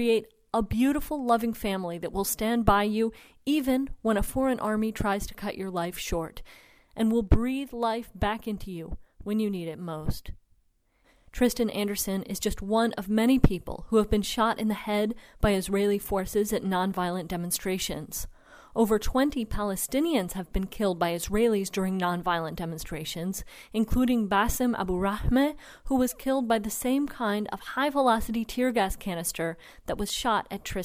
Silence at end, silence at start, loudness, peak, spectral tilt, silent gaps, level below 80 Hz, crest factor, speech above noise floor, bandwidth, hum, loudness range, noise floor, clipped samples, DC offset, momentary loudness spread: 0 s; 0 s; -28 LUFS; -6 dBFS; -5 dB/octave; none; -40 dBFS; 22 dB; 40 dB; 16.5 kHz; none; 4 LU; -67 dBFS; under 0.1%; under 0.1%; 10 LU